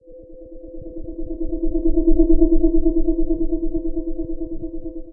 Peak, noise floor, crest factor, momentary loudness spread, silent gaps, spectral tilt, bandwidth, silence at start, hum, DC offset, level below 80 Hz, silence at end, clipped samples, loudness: -2 dBFS; -40 dBFS; 16 dB; 20 LU; none; -17.5 dB/octave; 1 kHz; 0.1 s; none; under 0.1%; -22 dBFS; 0 s; under 0.1%; -22 LUFS